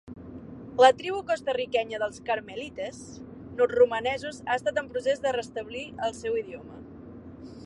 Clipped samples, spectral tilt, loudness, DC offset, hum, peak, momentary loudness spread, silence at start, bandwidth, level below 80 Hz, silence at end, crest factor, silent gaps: under 0.1%; -4 dB/octave; -27 LUFS; under 0.1%; none; -4 dBFS; 23 LU; 0.05 s; 11 kHz; -58 dBFS; 0 s; 24 dB; none